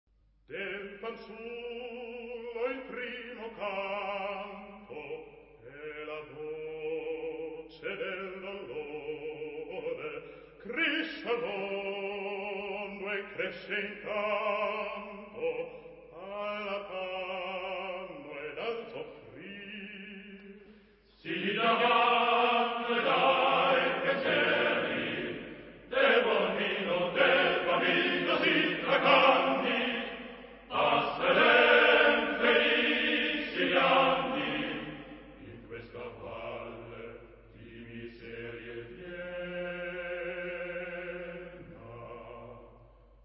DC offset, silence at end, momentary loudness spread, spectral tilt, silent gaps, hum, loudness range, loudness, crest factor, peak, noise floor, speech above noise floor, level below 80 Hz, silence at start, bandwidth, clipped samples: under 0.1%; 0.4 s; 21 LU; -7.5 dB/octave; none; none; 15 LU; -30 LUFS; 22 dB; -10 dBFS; -60 dBFS; 24 dB; -64 dBFS; 0.5 s; 5.8 kHz; under 0.1%